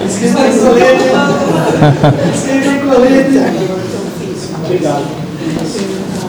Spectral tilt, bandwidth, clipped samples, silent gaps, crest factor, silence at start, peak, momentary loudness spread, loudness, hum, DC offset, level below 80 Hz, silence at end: -6 dB/octave; over 20 kHz; under 0.1%; none; 10 dB; 0 s; 0 dBFS; 12 LU; -11 LUFS; none; under 0.1%; -42 dBFS; 0 s